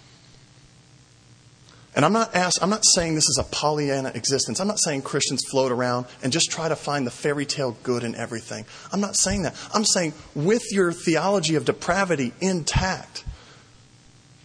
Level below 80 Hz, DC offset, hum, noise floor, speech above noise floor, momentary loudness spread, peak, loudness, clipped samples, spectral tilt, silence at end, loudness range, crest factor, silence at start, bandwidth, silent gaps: -44 dBFS; under 0.1%; none; -53 dBFS; 29 dB; 9 LU; -4 dBFS; -22 LUFS; under 0.1%; -3 dB/octave; 0.9 s; 4 LU; 22 dB; 1.95 s; 10.5 kHz; none